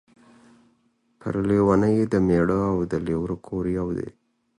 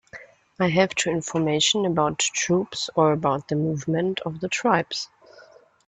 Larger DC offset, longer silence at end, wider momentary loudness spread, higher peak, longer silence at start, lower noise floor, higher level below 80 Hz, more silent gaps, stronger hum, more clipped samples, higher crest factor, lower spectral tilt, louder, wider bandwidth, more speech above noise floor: neither; about the same, 0.5 s vs 0.45 s; about the same, 11 LU vs 9 LU; about the same, -6 dBFS vs -4 dBFS; first, 1.25 s vs 0.15 s; first, -66 dBFS vs -52 dBFS; first, -46 dBFS vs -60 dBFS; neither; neither; neither; about the same, 18 dB vs 20 dB; first, -9 dB/octave vs -4 dB/octave; about the same, -23 LUFS vs -23 LUFS; first, 10.5 kHz vs 9.4 kHz; first, 44 dB vs 29 dB